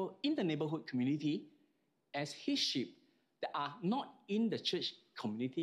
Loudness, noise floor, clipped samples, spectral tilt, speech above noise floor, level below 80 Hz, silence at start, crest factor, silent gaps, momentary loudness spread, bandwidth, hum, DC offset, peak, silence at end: -38 LUFS; -78 dBFS; under 0.1%; -5 dB/octave; 40 dB; -90 dBFS; 0 s; 16 dB; none; 8 LU; 13 kHz; none; under 0.1%; -22 dBFS; 0 s